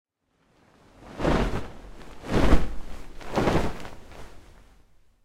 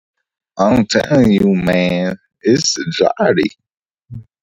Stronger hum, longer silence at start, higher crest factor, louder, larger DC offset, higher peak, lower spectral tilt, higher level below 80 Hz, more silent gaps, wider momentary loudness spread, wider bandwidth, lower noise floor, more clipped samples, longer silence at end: neither; first, 1.05 s vs 0.55 s; first, 22 dB vs 14 dB; second, -27 LUFS vs -14 LUFS; neither; second, -4 dBFS vs 0 dBFS; first, -6.5 dB/octave vs -5 dB/octave; first, -34 dBFS vs -44 dBFS; neither; first, 22 LU vs 8 LU; about the same, 13 kHz vs 13.5 kHz; first, -68 dBFS vs -35 dBFS; neither; first, 0.85 s vs 0.2 s